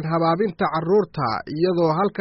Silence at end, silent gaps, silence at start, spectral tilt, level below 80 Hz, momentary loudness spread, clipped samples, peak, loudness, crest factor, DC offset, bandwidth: 0 s; none; 0 s; -6 dB/octave; -56 dBFS; 5 LU; under 0.1%; -8 dBFS; -21 LUFS; 12 dB; under 0.1%; 6 kHz